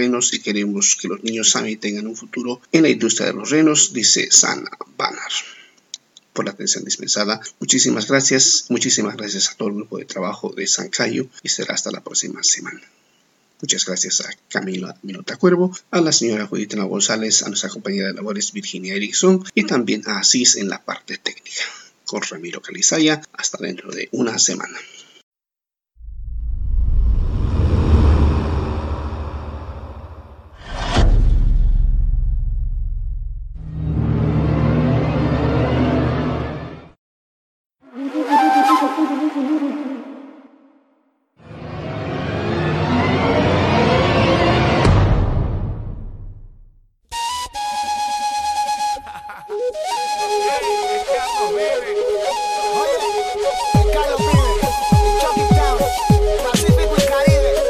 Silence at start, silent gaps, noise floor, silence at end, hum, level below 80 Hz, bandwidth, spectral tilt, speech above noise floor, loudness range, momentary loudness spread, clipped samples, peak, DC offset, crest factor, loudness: 0 s; 25.23-25.32 s, 36.98-37.70 s; -89 dBFS; 0 s; none; -26 dBFS; 15.5 kHz; -4 dB/octave; 69 dB; 7 LU; 15 LU; under 0.1%; 0 dBFS; under 0.1%; 18 dB; -18 LUFS